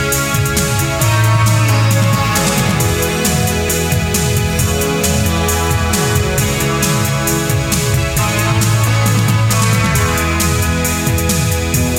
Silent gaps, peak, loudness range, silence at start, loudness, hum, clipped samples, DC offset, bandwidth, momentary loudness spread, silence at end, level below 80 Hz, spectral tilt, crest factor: none; 0 dBFS; 1 LU; 0 s; -14 LUFS; none; under 0.1%; under 0.1%; 17 kHz; 3 LU; 0 s; -26 dBFS; -4 dB/octave; 12 dB